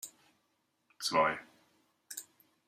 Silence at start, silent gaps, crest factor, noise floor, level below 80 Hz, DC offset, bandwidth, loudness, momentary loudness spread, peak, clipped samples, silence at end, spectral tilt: 0.05 s; none; 24 dB; -78 dBFS; -78 dBFS; under 0.1%; 15.5 kHz; -33 LUFS; 16 LU; -14 dBFS; under 0.1%; 0.45 s; -2 dB/octave